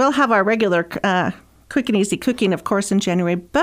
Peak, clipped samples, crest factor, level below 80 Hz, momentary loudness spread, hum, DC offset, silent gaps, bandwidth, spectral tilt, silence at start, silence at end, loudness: -4 dBFS; under 0.1%; 16 dB; -52 dBFS; 5 LU; none; under 0.1%; none; 16 kHz; -5 dB/octave; 0 s; 0 s; -19 LUFS